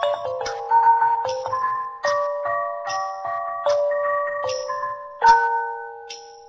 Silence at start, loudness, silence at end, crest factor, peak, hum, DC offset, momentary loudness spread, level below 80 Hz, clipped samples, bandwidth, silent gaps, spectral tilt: 0 s; -22 LUFS; 0 s; 20 dB; -2 dBFS; none; under 0.1%; 12 LU; -60 dBFS; under 0.1%; 7.8 kHz; none; -1.5 dB/octave